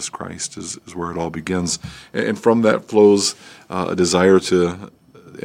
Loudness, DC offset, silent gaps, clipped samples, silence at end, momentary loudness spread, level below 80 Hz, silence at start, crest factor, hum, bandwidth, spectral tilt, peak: -18 LUFS; under 0.1%; none; under 0.1%; 0.05 s; 15 LU; -52 dBFS; 0 s; 18 dB; none; 15.5 kHz; -4.5 dB/octave; -2 dBFS